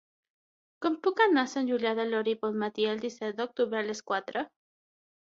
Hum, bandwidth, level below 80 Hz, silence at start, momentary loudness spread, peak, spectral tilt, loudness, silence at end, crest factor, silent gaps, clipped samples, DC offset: none; 7.8 kHz; -78 dBFS; 0.8 s; 10 LU; -10 dBFS; -4.5 dB/octave; -30 LUFS; 0.95 s; 20 dB; none; under 0.1%; under 0.1%